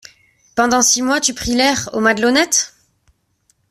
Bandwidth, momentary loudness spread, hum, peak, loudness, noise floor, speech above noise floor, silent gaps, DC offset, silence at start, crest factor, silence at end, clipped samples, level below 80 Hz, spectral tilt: 15.5 kHz; 5 LU; none; 0 dBFS; -15 LUFS; -62 dBFS; 47 dB; none; under 0.1%; 0.55 s; 16 dB; 1 s; under 0.1%; -44 dBFS; -1.5 dB/octave